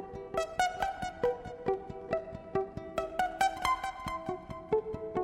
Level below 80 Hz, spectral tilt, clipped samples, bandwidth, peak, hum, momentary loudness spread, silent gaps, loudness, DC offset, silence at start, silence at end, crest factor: -54 dBFS; -4.5 dB/octave; under 0.1%; 16 kHz; -12 dBFS; none; 7 LU; none; -34 LUFS; under 0.1%; 0 s; 0 s; 22 dB